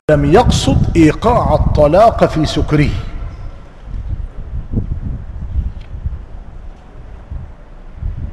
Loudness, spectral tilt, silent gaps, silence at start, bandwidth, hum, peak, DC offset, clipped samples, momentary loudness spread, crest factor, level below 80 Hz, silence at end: -13 LUFS; -6.5 dB/octave; none; 0.1 s; 12.5 kHz; none; 0 dBFS; 0.2%; under 0.1%; 21 LU; 14 dB; -22 dBFS; 0 s